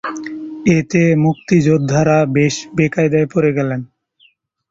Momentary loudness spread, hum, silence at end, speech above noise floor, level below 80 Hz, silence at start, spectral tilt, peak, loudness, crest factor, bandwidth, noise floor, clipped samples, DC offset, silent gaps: 10 LU; none; 0.85 s; 41 dB; -50 dBFS; 0.05 s; -7 dB/octave; -2 dBFS; -15 LUFS; 14 dB; 7.8 kHz; -55 dBFS; under 0.1%; under 0.1%; none